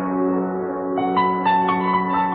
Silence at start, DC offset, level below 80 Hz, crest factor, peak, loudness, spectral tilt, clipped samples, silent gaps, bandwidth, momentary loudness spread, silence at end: 0 s; under 0.1%; -56 dBFS; 12 dB; -8 dBFS; -20 LUFS; -11 dB/octave; under 0.1%; none; 4.8 kHz; 6 LU; 0 s